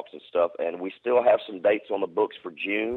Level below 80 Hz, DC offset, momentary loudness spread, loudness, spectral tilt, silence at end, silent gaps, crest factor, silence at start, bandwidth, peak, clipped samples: -74 dBFS; under 0.1%; 9 LU; -26 LUFS; -7 dB/octave; 0 s; none; 16 dB; 0 s; 4.3 kHz; -8 dBFS; under 0.1%